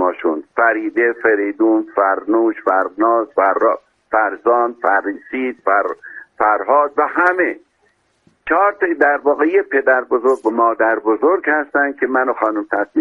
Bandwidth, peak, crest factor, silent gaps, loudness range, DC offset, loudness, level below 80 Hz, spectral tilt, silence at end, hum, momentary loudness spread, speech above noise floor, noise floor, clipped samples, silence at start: 6.8 kHz; 0 dBFS; 16 dB; none; 2 LU; under 0.1%; -16 LUFS; -62 dBFS; -6.5 dB/octave; 0 s; none; 6 LU; 45 dB; -61 dBFS; under 0.1%; 0 s